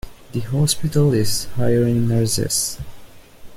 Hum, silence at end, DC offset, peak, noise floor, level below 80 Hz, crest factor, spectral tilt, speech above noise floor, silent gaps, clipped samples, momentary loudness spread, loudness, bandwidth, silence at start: none; 0 s; under 0.1%; -4 dBFS; -39 dBFS; -40 dBFS; 16 dB; -5 dB/octave; 21 dB; none; under 0.1%; 12 LU; -19 LUFS; 16.5 kHz; 0.05 s